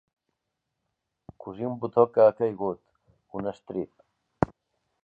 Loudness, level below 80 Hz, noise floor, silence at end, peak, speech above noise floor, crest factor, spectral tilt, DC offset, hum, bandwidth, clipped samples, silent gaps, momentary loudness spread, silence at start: -26 LUFS; -58 dBFS; -82 dBFS; 0.6 s; -2 dBFS; 57 dB; 26 dB; -9.5 dB/octave; under 0.1%; none; 4.9 kHz; under 0.1%; none; 20 LU; 1.45 s